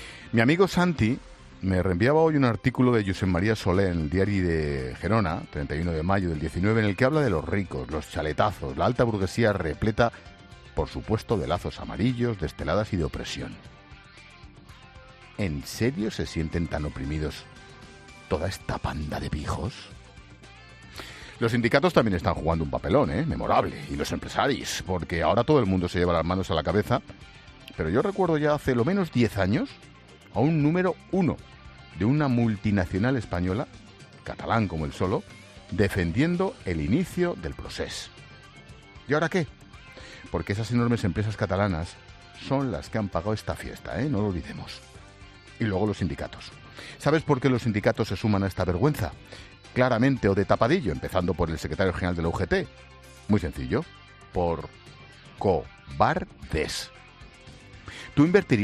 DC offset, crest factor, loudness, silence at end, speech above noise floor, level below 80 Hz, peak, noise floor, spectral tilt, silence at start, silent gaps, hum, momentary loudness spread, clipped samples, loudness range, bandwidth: under 0.1%; 22 dB; -26 LUFS; 0 s; 24 dB; -44 dBFS; -6 dBFS; -49 dBFS; -6.5 dB/octave; 0 s; none; none; 17 LU; under 0.1%; 7 LU; 13.5 kHz